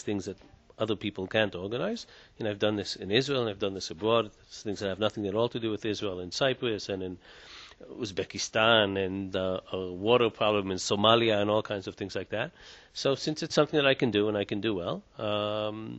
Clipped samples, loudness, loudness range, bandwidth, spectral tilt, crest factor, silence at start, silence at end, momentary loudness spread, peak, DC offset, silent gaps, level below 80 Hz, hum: under 0.1%; -29 LUFS; 5 LU; 8.2 kHz; -4.5 dB/octave; 22 dB; 0.05 s; 0 s; 14 LU; -8 dBFS; under 0.1%; none; -62 dBFS; none